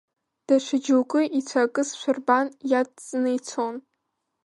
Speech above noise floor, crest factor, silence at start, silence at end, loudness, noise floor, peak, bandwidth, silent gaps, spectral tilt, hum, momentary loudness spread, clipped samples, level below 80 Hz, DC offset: 54 dB; 18 dB; 0.5 s; 0.65 s; -24 LUFS; -78 dBFS; -6 dBFS; 11.5 kHz; none; -3 dB/octave; none; 7 LU; under 0.1%; -80 dBFS; under 0.1%